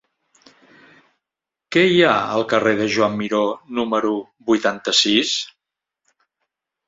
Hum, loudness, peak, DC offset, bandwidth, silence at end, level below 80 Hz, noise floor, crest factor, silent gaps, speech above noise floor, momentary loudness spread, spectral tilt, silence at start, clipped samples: none; -18 LUFS; -2 dBFS; under 0.1%; 7.8 kHz; 1.4 s; -60 dBFS; -86 dBFS; 20 dB; none; 68 dB; 9 LU; -3.5 dB/octave; 1.7 s; under 0.1%